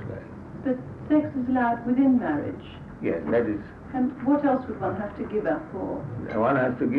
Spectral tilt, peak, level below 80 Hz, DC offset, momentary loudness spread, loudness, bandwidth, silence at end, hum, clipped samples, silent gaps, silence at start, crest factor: -9.5 dB/octave; -10 dBFS; -52 dBFS; under 0.1%; 12 LU; -26 LUFS; 4.5 kHz; 0 s; none; under 0.1%; none; 0 s; 14 dB